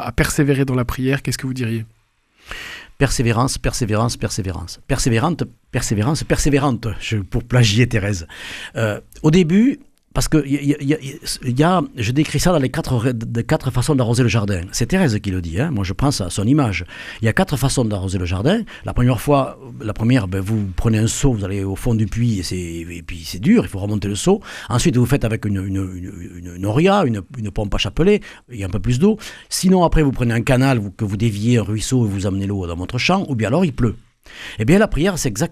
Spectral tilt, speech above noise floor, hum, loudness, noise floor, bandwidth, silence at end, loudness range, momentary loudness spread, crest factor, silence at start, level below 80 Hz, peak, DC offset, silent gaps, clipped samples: -5.5 dB/octave; 38 dB; none; -19 LUFS; -56 dBFS; 15.5 kHz; 0 s; 3 LU; 11 LU; 18 dB; 0 s; -32 dBFS; 0 dBFS; under 0.1%; none; under 0.1%